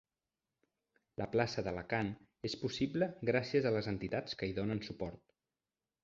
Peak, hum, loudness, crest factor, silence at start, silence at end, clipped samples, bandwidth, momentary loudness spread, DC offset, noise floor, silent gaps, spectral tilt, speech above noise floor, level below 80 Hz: -18 dBFS; none; -37 LUFS; 22 dB; 1.2 s; 0.85 s; under 0.1%; 7.6 kHz; 11 LU; under 0.1%; under -90 dBFS; none; -5 dB/octave; over 53 dB; -62 dBFS